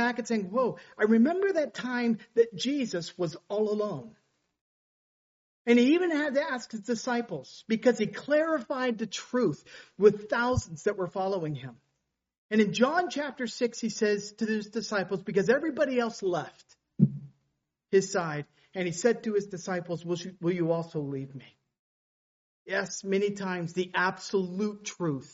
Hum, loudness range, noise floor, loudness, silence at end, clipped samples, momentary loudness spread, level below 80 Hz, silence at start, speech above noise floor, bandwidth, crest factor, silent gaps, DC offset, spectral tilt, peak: none; 5 LU; -81 dBFS; -29 LUFS; 0.05 s; under 0.1%; 11 LU; -62 dBFS; 0 s; 52 dB; 8 kHz; 22 dB; 4.61-5.65 s, 12.38-12.49 s, 21.79-22.66 s; under 0.1%; -5 dB/octave; -8 dBFS